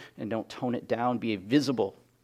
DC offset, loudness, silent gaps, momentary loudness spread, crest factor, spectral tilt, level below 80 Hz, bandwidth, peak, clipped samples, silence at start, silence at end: under 0.1%; -30 LUFS; none; 8 LU; 18 dB; -6 dB/octave; -72 dBFS; 14.5 kHz; -12 dBFS; under 0.1%; 0 s; 0.3 s